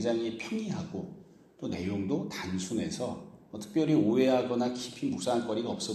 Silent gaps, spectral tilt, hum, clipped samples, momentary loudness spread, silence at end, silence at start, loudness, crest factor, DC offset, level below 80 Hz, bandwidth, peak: none; -5.5 dB/octave; none; under 0.1%; 15 LU; 0 s; 0 s; -31 LUFS; 18 dB; under 0.1%; -66 dBFS; 13 kHz; -14 dBFS